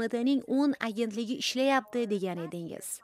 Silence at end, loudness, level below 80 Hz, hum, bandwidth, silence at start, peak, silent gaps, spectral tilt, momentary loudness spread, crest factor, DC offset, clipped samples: 0.05 s; -30 LUFS; -78 dBFS; none; 16 kHz; 0 s; -12 dBFS; none; -4 dB/octave; 10 LU; 18 dB; under 0.1%; under 0.1%